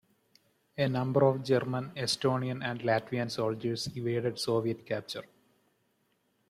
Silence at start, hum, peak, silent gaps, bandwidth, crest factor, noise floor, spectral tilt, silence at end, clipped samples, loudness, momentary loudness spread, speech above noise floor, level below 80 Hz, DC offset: 0.75 s; none; -14 dBFS; none; 14.5 kHz; 18 dB; -74 dBFS; -5.5 dB/octave; 1.25 s; under 0.1%; -31 LUFS; 10 LU; 44 dB; -68 dBFS; under 0.1%